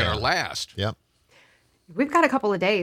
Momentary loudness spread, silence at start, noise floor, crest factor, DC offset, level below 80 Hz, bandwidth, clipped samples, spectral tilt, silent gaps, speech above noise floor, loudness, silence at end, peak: 10 LU; 0 s; -60 dBFS; 20 dB; under 0.1%; -50 dBFS; 15.5 kHz; under 0.1%; -4.5 dB/octave; none; 37 dB; -23 LUFS; 0 s; -6 dBFS